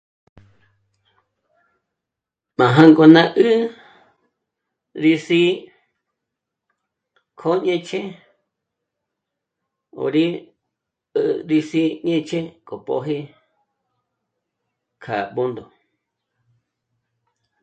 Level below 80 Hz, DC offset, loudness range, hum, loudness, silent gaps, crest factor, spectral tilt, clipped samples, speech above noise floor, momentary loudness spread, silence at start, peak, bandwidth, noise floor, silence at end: -66 dBFS; under 0.1%; 15 LU; none; -17 LUFS; none; 22 dB; -7 dB/octave; under 0.1%; 68 dB; 18 LU; 2.6 s; 0 dBFS; 8 kHz; -85 dBFS; 2 s